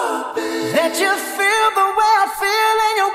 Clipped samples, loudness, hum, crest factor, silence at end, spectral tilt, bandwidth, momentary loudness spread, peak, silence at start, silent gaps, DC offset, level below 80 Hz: under 0.1%; -16 LUFS; none; 14 dB; 0 s; -1.5 dB/octave; 16 kHz; 7 LU; -4 dBFS; 0 s; none; under 0.1%; -58 dBFS